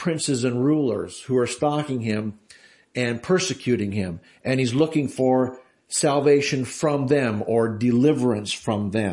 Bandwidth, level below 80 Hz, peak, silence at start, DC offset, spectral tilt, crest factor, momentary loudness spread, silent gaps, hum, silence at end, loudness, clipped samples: 11.5 kHz; -62 dBFS; -6 dBFS; 0 s; under 0.1%; -5.5 dB/octave; 16 dB; 8 LU; none; none; 0 s; -23 LUFS; under 0.1%